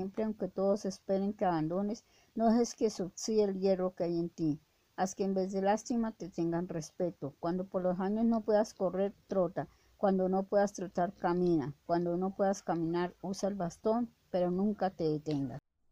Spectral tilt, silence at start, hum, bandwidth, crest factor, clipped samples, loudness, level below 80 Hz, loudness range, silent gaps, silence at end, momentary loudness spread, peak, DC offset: -6.5 dB/octave; 0 s; none; 15.5 kHz; 16 dB; under 0.1%; -33 LUFS; -64 dBFS; 2 LU; none; 0.35 s; 7 LU; -18 dBFS; under 0.1%